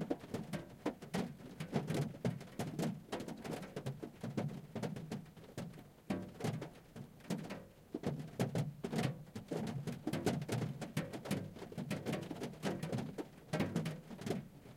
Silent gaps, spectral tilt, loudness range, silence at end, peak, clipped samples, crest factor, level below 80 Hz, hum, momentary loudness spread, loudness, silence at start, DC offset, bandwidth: none; -6 dB/octave; 5 LU; 0 s; -22 dBFS; under 0.1%; 20 dB; -68 dBFS; none; 10 LU; -43 LUFS; 0 s; under 0.1%; 16.5 kHz